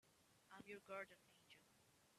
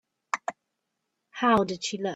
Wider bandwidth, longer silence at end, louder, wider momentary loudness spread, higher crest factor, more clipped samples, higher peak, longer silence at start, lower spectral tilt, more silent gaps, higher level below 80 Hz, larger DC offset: first, 14 kHz vs 11.5 kHz; about the same, 0 s vs 0 s; second, -57 LUFS vs -27 LUFS; about the same, 15 LU vs 15 LU; about the same, 22 dB vs 22 dB; neither; second, -38 dBFS vs -8 dBFS; second, 0.05 s vs 0.35 s; about the same, -3.5 dB/octave vs -4 dB/octave; neither; second, under -90 dBFS vs -64 dBFS; neither